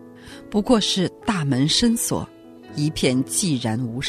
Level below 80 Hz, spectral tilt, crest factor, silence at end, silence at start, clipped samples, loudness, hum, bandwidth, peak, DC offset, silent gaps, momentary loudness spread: -46 dBFS; -4 dB/octave; 18 dB; 0 s; 0 s; under 0.1%; -21 LUFS; none; 14 kHz; -4 dBFS; under 0.1%; none; 14 LU